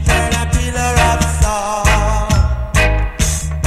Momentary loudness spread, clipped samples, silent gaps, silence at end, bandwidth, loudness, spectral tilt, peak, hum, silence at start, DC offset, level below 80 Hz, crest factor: 4 LU; under 0.1%; none; 0 s; 14.5 kHz; -15 LUFS; -4 dB/octave; 0 dBFS; none; 0 s; under 0.1%; -18 dBFS; 14 dB